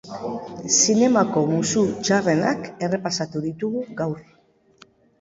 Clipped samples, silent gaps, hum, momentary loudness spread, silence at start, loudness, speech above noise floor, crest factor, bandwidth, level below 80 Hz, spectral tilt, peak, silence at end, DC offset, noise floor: under 0.1%; none; none; 14 LU; 0.05 s; -21 LUFS; 33 dB; 18 dB; 7.8 kHz; -60 dBFS; -4 dB/octave; -4 dBFS; 1 s; under 0.1%; -54 dBFS